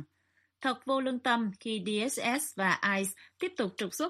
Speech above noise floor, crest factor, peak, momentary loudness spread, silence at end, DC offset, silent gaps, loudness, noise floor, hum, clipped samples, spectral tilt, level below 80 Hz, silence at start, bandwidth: 42 dB; 18 dB; -14 dBFS; 7 LU; 0 s; under 0.1%; none; -31 LUFS; -73 dBFS; none; under 0.1%; -3.5 dB/octave; -78 dBFS; 0 s; 15 kHz